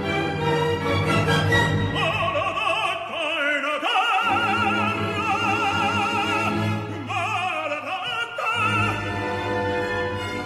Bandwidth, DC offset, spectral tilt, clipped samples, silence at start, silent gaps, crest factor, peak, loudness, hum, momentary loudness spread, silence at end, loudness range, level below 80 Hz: 14 kHz; under 0.1%; -5 dB/octave; under 0.1%; 0 s; none; 16 dB; -8 dBFS; -22 LUFS; none; 6 LU; 0 s; 3 LU; -50 dBFS